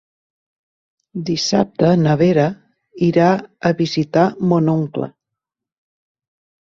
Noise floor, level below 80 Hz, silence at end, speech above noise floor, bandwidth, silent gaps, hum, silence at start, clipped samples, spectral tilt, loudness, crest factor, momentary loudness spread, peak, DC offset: -83 dBFS; -54 dBFS; 1.55 s; 67 dB; 7.6 kHz; none; none; 1.15 s; under 0.1%; -6.5 dB/octave; -17 LUFS; 16 dB; 10 LU; -2 dBFS; under 0.1%